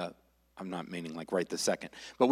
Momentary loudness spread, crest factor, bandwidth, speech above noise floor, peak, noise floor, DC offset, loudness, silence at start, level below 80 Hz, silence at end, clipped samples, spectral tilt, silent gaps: 12 LU; 22 dB; 16 kHz; 26 dB; -12 dBFS; -59 dBFS; under 0.1%; -35 LUFS; 0 s; -72 dBFS; 0 s; under 0.1%; -4 dB/octave; none